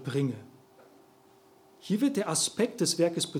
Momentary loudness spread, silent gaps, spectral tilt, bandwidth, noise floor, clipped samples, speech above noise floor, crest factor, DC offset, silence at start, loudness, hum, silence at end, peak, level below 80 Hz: 9 LU; none; -4 dB/octave; 17.5 kHz; -59 dBFS; under 0.1%; 31 dB; 18 dB; under 0.1%; 0 s; -28 LUFS; none; 0 s; -14 dBFS; -78 dBFS